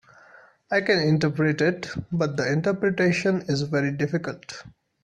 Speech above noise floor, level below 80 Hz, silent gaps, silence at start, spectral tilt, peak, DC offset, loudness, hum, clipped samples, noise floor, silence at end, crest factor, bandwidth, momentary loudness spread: 29 dB; -58 dBFS; none; 0.7 s; -6 dB/octave; -8 dBFS; under 0.1%; -24 LUFS; none; under 0.1%; -53 dBFS; 0.35 s; 18 dB; 9.6 kHz; 11 LU